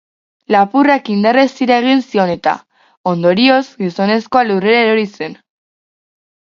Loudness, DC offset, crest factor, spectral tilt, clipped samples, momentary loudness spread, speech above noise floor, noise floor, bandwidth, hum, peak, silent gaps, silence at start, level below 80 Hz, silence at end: -13 LUFS; under 0.1%; 14 dB; -6.5 dB/octave; under 0.1%; 10 LU; over 77 dB; under -90 dBFS; 7.4 kHz; none; 0 dBFS; 2.97-3.04 s; 0.5 s; -60 dBFS; 1.15 s